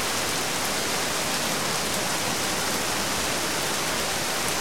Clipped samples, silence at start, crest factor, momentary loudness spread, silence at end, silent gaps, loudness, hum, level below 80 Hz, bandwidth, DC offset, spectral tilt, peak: under 0.1%; 0 s; 18 dB; 0 LU; 0 s; none; -24 LUFS; none; -52 dBFS; 16.5 kHz; 1%; -1.5 dB/octave; -8 dBFS